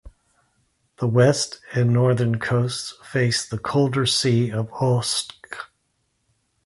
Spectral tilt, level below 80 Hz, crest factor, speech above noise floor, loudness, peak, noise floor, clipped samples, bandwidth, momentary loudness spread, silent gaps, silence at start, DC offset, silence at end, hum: -5 dB/octave; -54 dBFS; 18 dB; 50 dB; -21 LUFS; -4 dBFS; -71 dBFS; under 0.1%; 11.5 kHz; 12 LU; none; 0.05 s; under 0.1%; 1 s; none